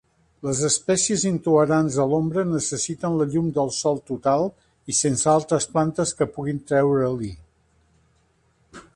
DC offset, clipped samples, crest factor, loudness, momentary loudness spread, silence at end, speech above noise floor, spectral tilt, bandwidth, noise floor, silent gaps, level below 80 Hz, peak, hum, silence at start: under 0.1%; under 0.1%; 16 dB; -22 LUFS; 6 LU; 0.15 s; 42 dB; -4.5 dB/octave; 11.5 kHz; -63 dBFS; none; -54 dBFS; -6 dBFS; none; 0.45 s